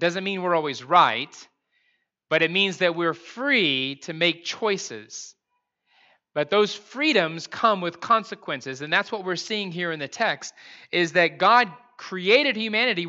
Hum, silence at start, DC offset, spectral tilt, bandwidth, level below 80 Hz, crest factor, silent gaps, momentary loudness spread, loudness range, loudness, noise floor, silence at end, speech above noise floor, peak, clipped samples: none; 0 s; under 0.1%; -3.5 dB/octave; 8 kHz; -82 dBFS; 20 dB; none; 13 LU; 4 LU; -23 LUFS; -77 dBFS; 0 s; 53 dB; -4 dBFS; under 0.1%